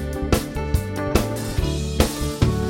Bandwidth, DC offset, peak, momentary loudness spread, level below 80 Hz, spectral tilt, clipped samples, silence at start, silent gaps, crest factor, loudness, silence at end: 16.5 kHz; under 0.1%; -2 dBFS; 3 LU; -28 dBFS; -5.5 dB/octave; under 0.1%; 0 s; none; 20 dB; -23 LUFS; 0 s